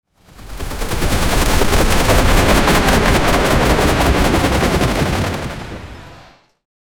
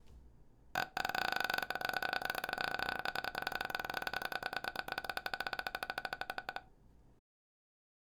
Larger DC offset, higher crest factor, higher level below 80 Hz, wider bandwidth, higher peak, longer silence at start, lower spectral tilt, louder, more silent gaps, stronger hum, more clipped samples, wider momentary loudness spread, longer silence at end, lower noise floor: neither; second, 14 dB vs 24 dB; first, -20 dBFS vs -64 dBFS; about the same, over 20 kHz vs over 20 kHz; first, 0 dBFS vs -16 dBFS; about the same, 0.05 s vs 0 s; first, -4.5 dB/octave vs -2 dB/octave; first, -15 LUFS vs -39 LUFS; neither; neither; neither; first, 16 LU vs 6 LU; second, 0.35 s vs 1.1 s; second, -44 dBFS vs -63 dBFS